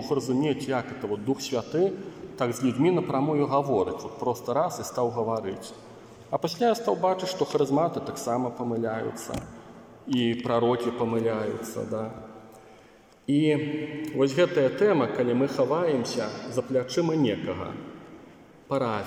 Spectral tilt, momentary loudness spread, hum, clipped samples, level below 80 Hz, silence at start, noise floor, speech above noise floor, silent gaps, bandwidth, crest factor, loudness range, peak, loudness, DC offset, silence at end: -6 dB/octave; 14 LU; none; under 0.1%; -62 dBFS; 0 s; -54 dBFS; 28 dB; none; 16 kHz; 16 dB; 4 LU; -10 dBFS; -27 LUFS; under 0.1%; 0 s